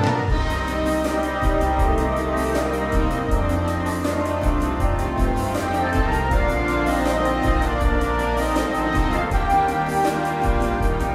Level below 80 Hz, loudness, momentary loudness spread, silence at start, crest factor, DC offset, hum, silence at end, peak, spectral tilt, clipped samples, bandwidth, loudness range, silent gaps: -24 dBFS; -21 LUFS; 3 LU; 0 s; 14 dB; under 0.1%; none; 0 s; -6 dBFS; -6 dB/octave; under 0.1%; 15.5 kHz; 1 LU; none